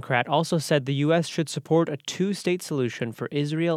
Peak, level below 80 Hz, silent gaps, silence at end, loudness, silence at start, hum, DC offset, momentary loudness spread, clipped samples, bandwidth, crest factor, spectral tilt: -6 dBFS; -72 dBFS; none; 0 s; -25 LUFS; 0 s; none; under 0.1%; 6 LU; under 0.1%; 15 kHz; 20 dB; -5.5 dB/octave